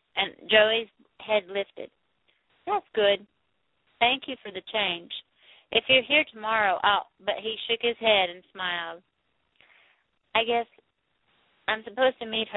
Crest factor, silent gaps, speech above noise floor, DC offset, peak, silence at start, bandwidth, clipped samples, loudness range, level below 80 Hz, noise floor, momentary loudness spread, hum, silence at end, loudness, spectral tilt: 22 dB; none; 49 dB; under 0.1%; -6 dBFS; 0.15 s; 4.1 kHz; under 0.1%; 6 LU; -66 dBFS; -75 dBFS; 17 LU; none; 0 s; -25 LUFS; -7 dB/octave